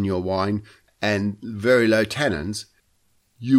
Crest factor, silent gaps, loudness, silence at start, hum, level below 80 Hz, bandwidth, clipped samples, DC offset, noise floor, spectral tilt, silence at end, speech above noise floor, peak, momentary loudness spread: 16 dB; none; -22 LUFS; 0 s; none; -52 dBFS; 15 kHz; under 0.1%; under 0.1%; -65 dBFS; -6 dB/octave; 0 s; 43 dB; -6 dBFS; 13 LU